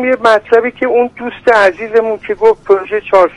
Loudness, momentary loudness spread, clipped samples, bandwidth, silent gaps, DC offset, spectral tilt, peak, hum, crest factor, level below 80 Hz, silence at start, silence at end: -11 LUFS; 5 LU; 0.2%; 10.5 kHz; none; under 0.1%; -4.5 dB/octave; 0 dBFS; none; 12 dB; -48 dBFS; 0 s; 0.05 s